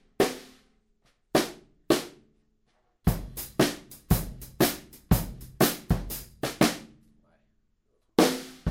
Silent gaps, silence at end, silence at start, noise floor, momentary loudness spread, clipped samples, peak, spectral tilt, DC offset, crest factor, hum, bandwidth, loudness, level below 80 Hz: none; 0 s; 0.2 s; -71 dBFS; 15 LU; under 0.1%; -6 dBFS; -5 dB/octave; under 0.1%; 24 dB; none; 16.5 kHz; -28 LUFS; -40 dBFS